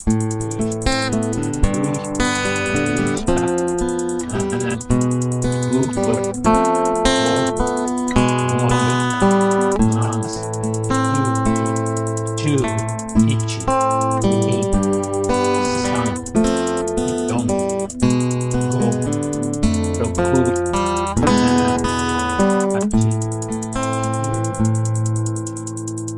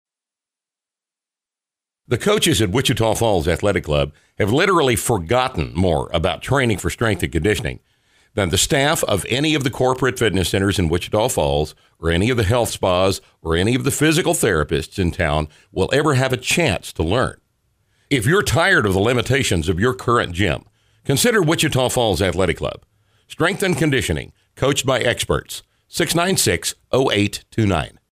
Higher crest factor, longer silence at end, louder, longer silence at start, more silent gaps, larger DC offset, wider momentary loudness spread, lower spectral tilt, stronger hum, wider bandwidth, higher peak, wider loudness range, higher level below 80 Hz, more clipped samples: about the same, 18 dB vs 14 dB; second, 0 s vs 0.25 s; about the same, -19 LUFS vs -18 LUFS; second, 0 s vs 2.1 s; neither; neither; about the same, 6 LU vs 8 LU; about the same, -5.5 dB/octave vs -4.5 dB/octave; neither; second, 11.5 kHz vs 16 kHz; first, 0 dBFS vs -4 dBFS; about the same, 2 LU vs 2 LU; about the same, -34 dBFS vs -38 dBFS; neither